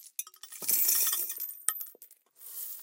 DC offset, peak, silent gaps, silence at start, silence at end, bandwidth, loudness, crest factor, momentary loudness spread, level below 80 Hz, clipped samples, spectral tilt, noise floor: under 0.1%; -2 dBFS; none; 0 s; 0 s; 17 kHz; -28 LUFS; 30 dB; 19 LU; under -90 dBFS; under 0.1%; 2.5 dB/octave; -57 dBFS